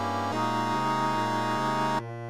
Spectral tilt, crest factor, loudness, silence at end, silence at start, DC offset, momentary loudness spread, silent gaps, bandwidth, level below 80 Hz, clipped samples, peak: -5 dB/octave; 12 dB; -27 LUFS; 0 s; 0 s; 0.5%; 2 LU; none; 18 kHz; -66 dBFS; under 0.1%; -16 dBFS